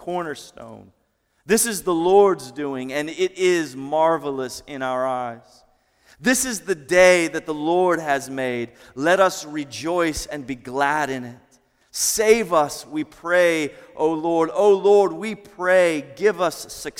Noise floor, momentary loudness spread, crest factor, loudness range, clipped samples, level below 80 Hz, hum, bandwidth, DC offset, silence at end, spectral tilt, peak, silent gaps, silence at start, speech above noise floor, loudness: -67 dBFS; 14 LU; 18 dB; 4 LU; under 0.1%; -54 dBFS; none; 17 kHz; under 0.1%; 0.1 s; -3.5 dB/octave; -2 dBFS; none; 0.05 s; 47 dB; -20 LUFS